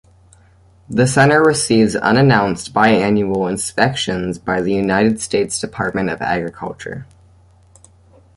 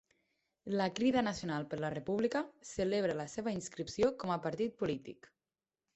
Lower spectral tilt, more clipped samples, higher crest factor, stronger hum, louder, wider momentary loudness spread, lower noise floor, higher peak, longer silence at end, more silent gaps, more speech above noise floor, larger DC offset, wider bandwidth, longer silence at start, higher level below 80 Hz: about the same, -5 dB/octave vs -5.5 dB/octave; neither; about the same, 16 dB vs 18 dB; neither; first, -16 LUFS vs -36 LUFS; about the same, 11 LU vs 9 LU; second, -49 dBFS vs under -90 dBFS; first, -2 dBFS vs -20 dBFS; first, 1.35 s vs 0.8 s; neither; second, 34 dB vs over 54 dB; neither; first, 11.5 kHz vs 8.2 kHz; first, 0.9 s vs 0.65 s; first, -46 dBFS vs -66 dBFS